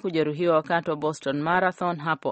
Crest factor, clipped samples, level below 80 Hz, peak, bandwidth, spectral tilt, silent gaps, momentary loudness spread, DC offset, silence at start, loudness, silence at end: 16 dB; under 0.1%; -64 dBFS; -8 dBFS; 8.4 kHz; -6 dB/octave; none; 5 LU; under 0.1%; 0.05 s; -25 LUFS; 0 s